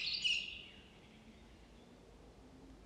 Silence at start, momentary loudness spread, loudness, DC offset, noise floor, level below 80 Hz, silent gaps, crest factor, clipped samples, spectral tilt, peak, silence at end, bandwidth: 0 s; 26 LU; -37 LUFS; under 0.1%; -60 dBFS; -66 dBFS; none; 22 dB; under 0.1%; -1 dB/octave; -24 dBFS; 0 s; 13 kHz